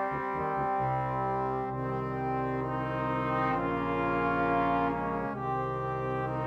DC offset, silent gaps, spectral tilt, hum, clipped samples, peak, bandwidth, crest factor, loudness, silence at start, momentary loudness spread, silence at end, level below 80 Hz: under 0.1%; none; -9 dB/octave; none; under 0.1%; -16 dBFS; 7 kHz; 14 dB; -31 LUFS; 0 s; 5 LU; 0 s; -52 dBFS